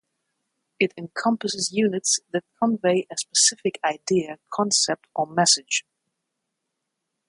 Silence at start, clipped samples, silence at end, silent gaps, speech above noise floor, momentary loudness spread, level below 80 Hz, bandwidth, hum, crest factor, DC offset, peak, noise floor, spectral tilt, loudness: 0.8 s; under 0.1%; 1.5 s; none; 57 dB; 8 LU; -72 dBFS; 11.5 kHz; none; 22 dB; under 0.1%; -4 dBFS; -80 dBFS; -2.5 dB/octave; -22 LUFS